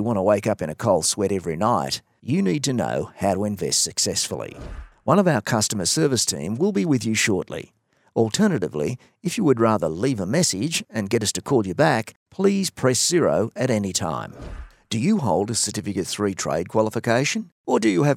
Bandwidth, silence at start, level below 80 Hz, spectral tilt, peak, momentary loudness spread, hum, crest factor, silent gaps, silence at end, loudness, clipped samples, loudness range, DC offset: 16.5 kHz; 0 s; -50 dBFS; -4 dB/octave; -2 dBFS; 10 LU; none; 20 dB; 12.16-12.26 s, 17.52-17.64 s; 0 s; -22 LUFS; under 0.1%; 2 LU; under 0.1%